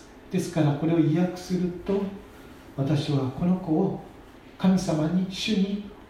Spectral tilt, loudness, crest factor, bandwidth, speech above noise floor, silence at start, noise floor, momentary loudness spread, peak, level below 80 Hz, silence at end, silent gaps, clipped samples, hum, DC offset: -7 dB/octave; -26 LUFS; 16 dB; 13.5 kHz; 23 dB; 0 s; -47 dBFS; 11 LU; -10 dBFS; -52 dBFS; 0.05 s; none; under 0.1%; none; under 0.1%